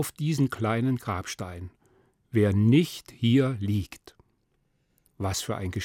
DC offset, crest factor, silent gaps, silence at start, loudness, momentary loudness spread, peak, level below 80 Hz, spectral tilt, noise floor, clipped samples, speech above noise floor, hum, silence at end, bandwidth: under 0.1%; 16 dB; none; 0 s; -26 LUFS; 14 LU; -10 dBFS; -60 dBFS; -6 dB/octave; -71 dBFS; under 0.1%; 46 dB; none; 0 s; 17 kHz